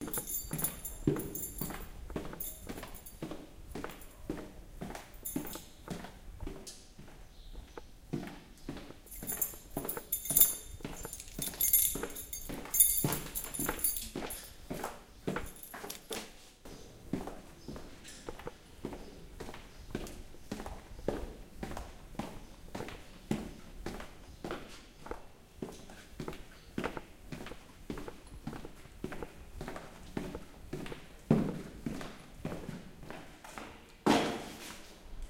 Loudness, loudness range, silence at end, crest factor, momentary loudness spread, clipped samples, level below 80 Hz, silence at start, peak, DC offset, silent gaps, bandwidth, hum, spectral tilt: -36 LUFS; 16 LU; 0 s; 32 dB; 19 LU; under 0.1%; -52 dBFS; 0 s; -6 dBFS; under 0.1%; none; 17 kHz; none; -3.5 dB/octave